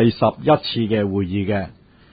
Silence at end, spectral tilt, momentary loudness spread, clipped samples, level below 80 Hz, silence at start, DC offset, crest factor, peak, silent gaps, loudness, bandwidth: 0.4 s; -12 dB/octave; 7 LU; under 0.1%; -44 dBFS; 0 s; under 0.1%; 16 dB; -4 dBFS; none; -20 LUFS; 5 kHz